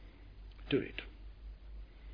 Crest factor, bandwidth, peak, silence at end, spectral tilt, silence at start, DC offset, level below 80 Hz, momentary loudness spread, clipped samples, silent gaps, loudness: 22 dB; 5.2 kHz; -20 dBFS; 0 s; -4.5 dB/octave; 0 s; under 0.1%; -52 dBFS; 20 LU; under 0.1%; none; -38 LUFS